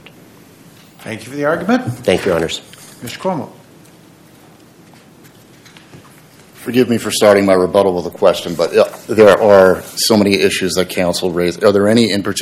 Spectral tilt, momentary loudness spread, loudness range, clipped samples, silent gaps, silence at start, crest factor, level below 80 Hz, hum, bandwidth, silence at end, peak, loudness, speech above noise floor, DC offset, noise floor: -4.5 dB/octave; 16 LU; 15 LU; 0.4%; none; 1 s; 14 dB; -50 dBFS; none; 16 kHz; 0 s; 0 dBFS; -13 LUFS; 30 dB; under 0.1%; -43 dBFS